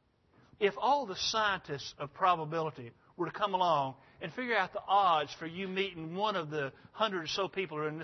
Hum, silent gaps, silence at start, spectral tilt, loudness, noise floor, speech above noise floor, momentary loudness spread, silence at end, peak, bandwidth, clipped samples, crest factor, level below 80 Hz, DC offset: none; none; 0.6 s; -2 dB/octave; -33 LUFS; -66 dBFS; 33 dB; 11 LU; 0 s; -14 dBFS; 6.2 kHz; under 0.1%; 18 dB; -72 dBFS; under 0.1%